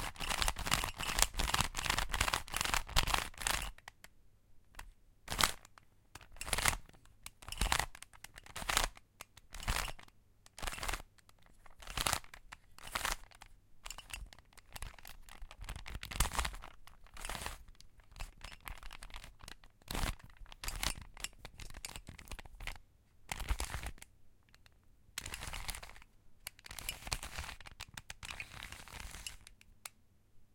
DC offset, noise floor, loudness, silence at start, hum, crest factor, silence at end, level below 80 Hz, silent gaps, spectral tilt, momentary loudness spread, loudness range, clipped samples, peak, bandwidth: under 0.1%; -65 dBFS; -39 LUFS; 0 s; none; 38 dB; 0.1 s; -48 dBFS; none; -1.5 dB/octave; 22 LU; 11 LU; under 0.1%; -4 dBFS; 17 kHz